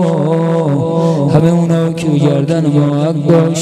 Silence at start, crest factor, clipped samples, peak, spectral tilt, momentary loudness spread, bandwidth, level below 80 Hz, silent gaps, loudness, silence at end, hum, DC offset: 0 s; 10 dB; under 0.1%; 0 dBFS; -8 dB/octave; 3 LU; 10.5 kHz; -48 dBFS; none; -12 LUFS; 0 s; none; under 0.1%